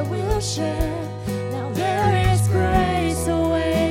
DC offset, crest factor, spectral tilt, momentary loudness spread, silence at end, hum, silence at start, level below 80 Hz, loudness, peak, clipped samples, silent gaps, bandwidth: under 0.1%; 16 dB; -6 dB/octave; 8 LU; 0 s; none; 0 s; -32 dBFS; -21 LUFS; -6 dBFS; under 0.1%; none; 16.5 kHz